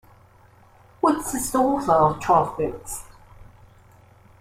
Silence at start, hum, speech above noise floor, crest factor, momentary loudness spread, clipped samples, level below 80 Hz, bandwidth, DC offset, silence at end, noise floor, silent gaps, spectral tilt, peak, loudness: 1.05 s; none; 32 dB; 20 dB; 14 LU; under 0.1%; -48 dBFS; 16.5 kHz; under 0.1%; 0.95 s; -53 dBFS; none; -5.5 dB/octave; -6 dBFS; -22 LUFS